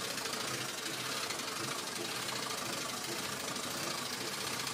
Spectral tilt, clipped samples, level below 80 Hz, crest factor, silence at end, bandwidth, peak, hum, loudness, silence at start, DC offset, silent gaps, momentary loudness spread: -1.5 dB/octave; under 0.1%; -76 dBFS; 16 dB; 0 s; 16 kHz; -22 dBFS; none; -36 LUFS; 0 s; under 0.1%; none; 1 LU